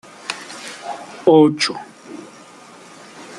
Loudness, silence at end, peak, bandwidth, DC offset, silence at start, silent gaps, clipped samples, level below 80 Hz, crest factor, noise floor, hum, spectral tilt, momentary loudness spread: -17 LUFS; 0 s; -2 dBFS; 11.5 kHz; under 0.1%; 0.25 s; none; under 0.1%; -68 dBFS; 18 dB; -42 dBFS; none; -5 dB/octave; 27 LU